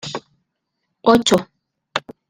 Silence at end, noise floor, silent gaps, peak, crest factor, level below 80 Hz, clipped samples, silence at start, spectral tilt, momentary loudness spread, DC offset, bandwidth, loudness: 0.3 s; -75 dBFS; none; -2 dBFS; 20 dB; -54 dBFS; under 0.1%; 0.05 s; -4 dB/octave; 16 LU; under 0.1%; 16 kHz; -18 LUFS